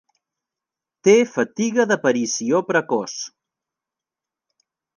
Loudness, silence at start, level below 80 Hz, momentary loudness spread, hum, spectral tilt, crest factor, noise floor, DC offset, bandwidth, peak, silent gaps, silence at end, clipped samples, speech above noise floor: -19 LUFS; 1.05 s; -76 dBFS; 11 LU; none; -4 dB/octave; 18 dB; -88 dBFS; under 0.1%; 10 kHz; -4 dBFS; none; 1.7 s; under 0.1%; 69 dB